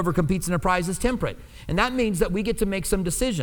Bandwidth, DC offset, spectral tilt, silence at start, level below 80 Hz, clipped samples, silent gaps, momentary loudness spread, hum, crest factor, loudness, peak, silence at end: 19.5 kHz; under 0.1%; -5 dB/octave; 0 s; -34 dBFS; under 0.1%; none; 6 LU; none; 16 dB; -24 LUFS; -6 dBFS; 0 s